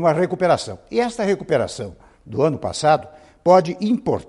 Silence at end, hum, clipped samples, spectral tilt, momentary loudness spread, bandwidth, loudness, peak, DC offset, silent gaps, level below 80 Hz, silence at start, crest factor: 0.05 s; none; under 0.1%; -6 dB/octave; 10 LU; 11.5 kHz; -20 LUFS; -2 dBFS; under 0.1%; none; -52 dBFS; 0 s; 18 dB